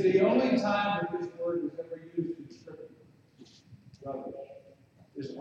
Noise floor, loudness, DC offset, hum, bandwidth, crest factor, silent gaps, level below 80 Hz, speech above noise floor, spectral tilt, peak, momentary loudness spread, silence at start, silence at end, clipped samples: -59 dBFS; -30 LUFS; under 0.1%; none; 7.6 kHz; 20 dB; none; -72 dBFS; 31 dB; -7 dB/octave; -12 dBFS; 24 LU; 0 s; 0 s; under 0.1%